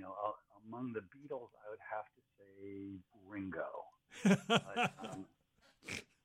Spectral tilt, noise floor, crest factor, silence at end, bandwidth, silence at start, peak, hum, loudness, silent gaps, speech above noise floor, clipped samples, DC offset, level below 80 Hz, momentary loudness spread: -5 dB/octave; -71 dBFS; 22 dB; 0.2 s; 13.5 kHz; 0 s; -18 dBFS; none; -40 LUFS; none; 31 dB; under 0.1%; under 0.1%; -78 dBFS; 21 LU